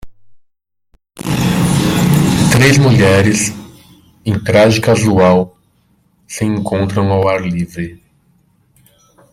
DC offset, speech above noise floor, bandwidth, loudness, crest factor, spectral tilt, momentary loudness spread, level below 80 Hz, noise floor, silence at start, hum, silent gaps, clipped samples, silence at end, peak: under 0.1%; 53 dB; 16.5 kHz; -12 LUFS; 14 dB; -5.5 dB/octave; 15 LU; -40 dBFS; -64 dBFS; 0.05 s; none; none; under 0.1%; 1.35 s; 0 dBFS